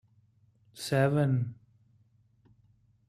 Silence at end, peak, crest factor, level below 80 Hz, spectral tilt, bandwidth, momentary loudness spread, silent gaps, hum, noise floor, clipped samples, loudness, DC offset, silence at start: 1.55 s; -14 dBFS; 20 dB; -68 dBFS; -7 dB/octave; 14 kHz; 13 LU; none; none; -66 dBFS; under 0.1%; -29 LUFS; under 0.1%; 0.75 s